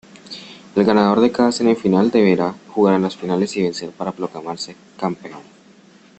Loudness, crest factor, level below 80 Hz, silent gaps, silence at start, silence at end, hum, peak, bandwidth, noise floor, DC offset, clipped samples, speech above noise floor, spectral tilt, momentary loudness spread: -18 LUFS; 16 dB; -58 dBFS; none; 0.25 s; 0.75 s; none; -2 dBFS; 8.6 kHz; -48 dBFS; under 0.1%; under 0.1%; 30 dB; -6 dB/octave; 18 LU